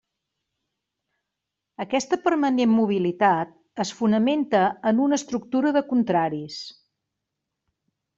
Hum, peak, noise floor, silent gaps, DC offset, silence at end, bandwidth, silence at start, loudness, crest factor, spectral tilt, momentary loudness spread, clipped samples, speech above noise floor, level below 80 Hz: none; -6 dBFS; -84 dBFS; none; under 0.1%; 1.45 s; 7.8 kHz; 1.8 s; -23 LUFS; 18 dB; -5.5 dB/octave; 12 LU; under 0.1%; 62 dB; -68 dBFS